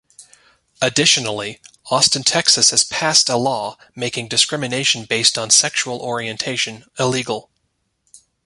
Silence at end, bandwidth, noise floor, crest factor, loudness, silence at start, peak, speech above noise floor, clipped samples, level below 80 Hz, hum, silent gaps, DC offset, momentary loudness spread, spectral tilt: 0.3 s; 16 kHz; -70 dBFS; 20 dB; -16 LUFS; 0.2 s; 0 dBFS; 51 dB; under 0.1%; -58 dBFS; none; none; under 0.1%; 12 LU; -1.5 dB/octave